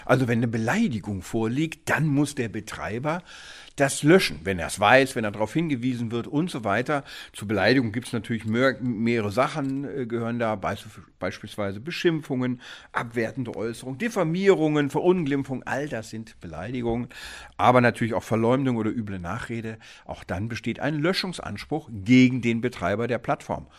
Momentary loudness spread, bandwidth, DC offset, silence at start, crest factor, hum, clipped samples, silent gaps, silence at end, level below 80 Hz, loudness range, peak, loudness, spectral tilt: 14 LU; 14.5 kHz; under 0.1%; 0 s; 22 dB; none; under 0.1%; none; 0.15 s; -54 dBFS; 6 LU; -2 dBFS; -25 LUFS; -6 dB/octave